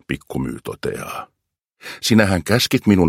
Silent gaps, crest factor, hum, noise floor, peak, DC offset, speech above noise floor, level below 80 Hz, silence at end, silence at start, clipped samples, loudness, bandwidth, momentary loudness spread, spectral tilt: none; 18 dB; none; -64 dBFS; 0 dBFS; under 0.1%; 46 dB; -46 dBFS; 0 s; 0.1 s; under 0.1%; -19 LUFS; 16.5 kHz; 17 LU; -5 dB/octave